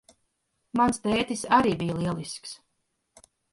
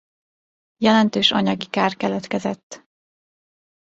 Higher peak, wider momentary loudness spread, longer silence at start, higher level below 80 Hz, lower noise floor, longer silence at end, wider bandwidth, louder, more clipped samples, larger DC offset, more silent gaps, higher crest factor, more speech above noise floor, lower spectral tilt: second, -6 dBFS vs -2 dBFS; first, 16 LU vs 9 LU; about the same, 0.75 s vs 0.8 s; first, -56 dBFS vs -62 dBFS; second, -76 dBFS vs under -90 dBFS; second, 0.95 s vs 1.2 s; first, 11.5 kHz vs 8 kHz; second, -26 LUFS vs -20 LUFS; neither; neither; second, none vs 2.63-2.70 s; about the same, 22 dB vs 20 dB; second, 51 dB vs over 70 dB; about the same, -5 dB/octave vs -5 dB/octave